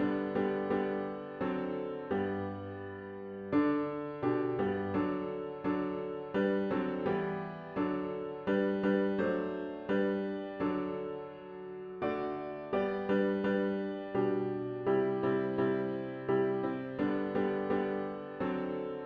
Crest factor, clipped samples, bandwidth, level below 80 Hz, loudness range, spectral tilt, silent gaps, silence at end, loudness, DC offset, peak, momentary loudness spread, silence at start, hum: 14 dB; under 0.1%; 5.2 kHz; -66 dBFS; 3 LU; -9.5 dB/octave; none; 0 s; -34 LUFS; under 0.1%; -18 dBFS; 9 LU; 0 s; none